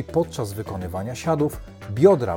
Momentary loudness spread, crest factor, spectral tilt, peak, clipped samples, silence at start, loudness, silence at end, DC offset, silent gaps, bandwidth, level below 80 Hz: 14 LU; 18 dB; -7 dB/octave; -4 dBFS; under 0.1%; 0 s; -23 LUFS; 0 s; under 0.1%; none; 17 kHz; -46 dBFS